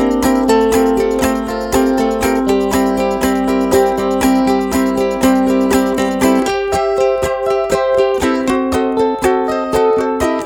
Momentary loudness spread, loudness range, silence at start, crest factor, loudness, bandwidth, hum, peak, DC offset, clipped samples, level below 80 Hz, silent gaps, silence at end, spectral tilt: 3 LU; 1 LU; 0 s; 14 dB; -14 LUFS; 19.5 kHz; none; 0 dBFS; under 0.1%; under 0.1%; -34 dBFS; none; 0 s; -5 dB/octave